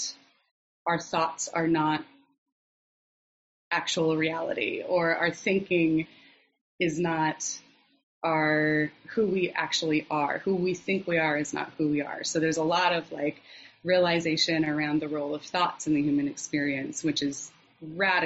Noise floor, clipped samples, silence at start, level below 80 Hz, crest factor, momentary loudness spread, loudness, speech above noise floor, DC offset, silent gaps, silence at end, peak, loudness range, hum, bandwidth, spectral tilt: under -90 dBFS; under 0.1%; 0 s; -68 dBFS; 18 dB; 8 LU; -27 LUFS; over 63 dB; under 0.1%; 0.51-0.86 s, 2.38-2.46 s, 2.52-3.71 s, 6.61-6.78 s, 8.03-8.21 s; 0 s; -10 dBFS; 3 LU; none; 8 kHz; -3.5 dB/octave